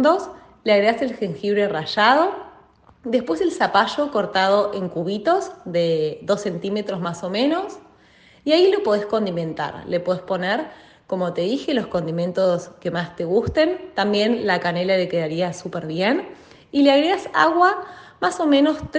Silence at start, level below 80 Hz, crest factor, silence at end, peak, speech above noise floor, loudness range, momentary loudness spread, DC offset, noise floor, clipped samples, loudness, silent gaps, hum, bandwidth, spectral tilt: 0 s; -56 dBFS; 20 dB; 0 s; 0 dBFS; 32 dB; 4 LU; 10 LU; under 0.1%; -52 dBFS; under 0.1%; -21 LUFS; none; none; 9.4 kHz; -5.5 dB/octave